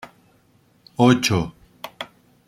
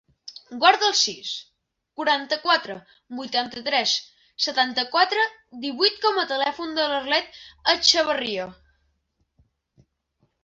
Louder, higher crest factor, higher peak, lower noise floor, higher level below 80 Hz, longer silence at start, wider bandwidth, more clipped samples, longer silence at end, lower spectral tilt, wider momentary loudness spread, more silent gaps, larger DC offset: first, -19 LUFS vs -22 LUFS; about the same, 22 dB vs 22 dB; about the same, -2 dBFS vs -2 dBFS; second, -59 dBFS vs -72 dBFS; first, -52 dBFS vs -66 dBFS; second, 0.05 s vs 0.25 s; first, 16 kHz vs 8 kHz; neither; second, 0.45 s vs 1.9 s; first, -5 dB/octave vs -0.5 dB/octave; about the same, 22 LU vs 20 LU; neither; neither